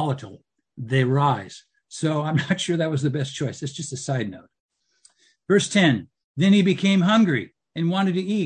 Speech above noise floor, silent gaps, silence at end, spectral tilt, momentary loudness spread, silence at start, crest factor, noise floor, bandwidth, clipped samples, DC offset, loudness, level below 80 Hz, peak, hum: 39 dB; 4.60-4.69 s, 6.24-6.35 s; 0 s; -5.5 dB/octave; 14 LU; 0 s; 18 dB; -60 dBFS; 9.4 kHz; under 0.1%; under 0.1%; -22 LUFS; -66 dBFS; -6 dBFS; none